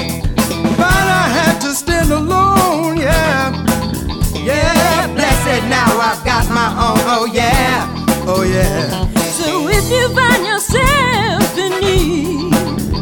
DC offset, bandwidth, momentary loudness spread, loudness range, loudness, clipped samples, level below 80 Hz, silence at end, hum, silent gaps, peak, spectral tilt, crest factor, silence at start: under 0.1%; 17 kHz; 5 LU; 1 LU; -13 LUFS; under 0.1%; -24 dBFS; 0 s; none; none; 0 dBFS; -4.5 dB/octave; 14 dB; 0 s